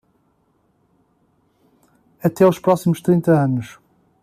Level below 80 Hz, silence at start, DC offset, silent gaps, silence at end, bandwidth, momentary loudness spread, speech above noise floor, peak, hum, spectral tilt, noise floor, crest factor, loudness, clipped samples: -60 dBFS; 2.25 s; under 0.1%; none; 0.55 s; 15 kHz; 9 LU; 47 dB; -4 dBFS; none; -8 dB/octave; -63 dBFS; 18 dB; -17 LUFS; under 0.1%